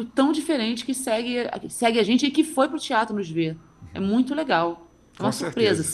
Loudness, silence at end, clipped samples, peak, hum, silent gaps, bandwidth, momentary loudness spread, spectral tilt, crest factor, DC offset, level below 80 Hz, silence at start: -24 LUFS; 0 s; under 0.1%; -4 dBFS; none; none; 12.5 kHz; 9 LU; -4.5 dB/octave; 20 dB; under 0.1%; -60 dBFS; 0 s